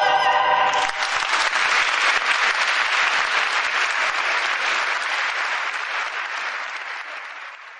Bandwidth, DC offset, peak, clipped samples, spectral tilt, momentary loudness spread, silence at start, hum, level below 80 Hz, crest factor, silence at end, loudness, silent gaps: 10.5 kHz; under 0.1%; -6 dBFS; under 0.1%; 1 dB/octave; 11 LU; 0 s; none; -62 dBFS; 16 dB; 0 s; -20 LUFS; none